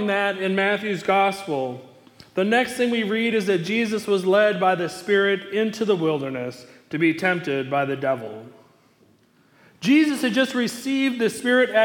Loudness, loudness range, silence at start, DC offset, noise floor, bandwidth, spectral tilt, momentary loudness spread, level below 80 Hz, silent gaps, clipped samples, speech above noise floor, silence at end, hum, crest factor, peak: -22 LUFS; 4 LU; 0 s; under 0.1%; -58 dBFS; 18 kHz; -5 dB/octave; 10 LU; -70 dBFS; none; under 0.1%; 37 dB; 0 s; none; 16 dB; -6 dBFS